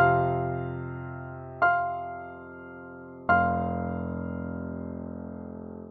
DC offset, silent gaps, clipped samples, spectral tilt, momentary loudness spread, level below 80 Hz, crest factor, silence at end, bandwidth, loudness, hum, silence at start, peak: under 0.1%; none; under 0.1%; -7 dB/octave; 18 LU; -52 dBFS; 20 dB; 0 s; 4.6 kHz; -29 LUFS; none; 0 s; -10 dBFS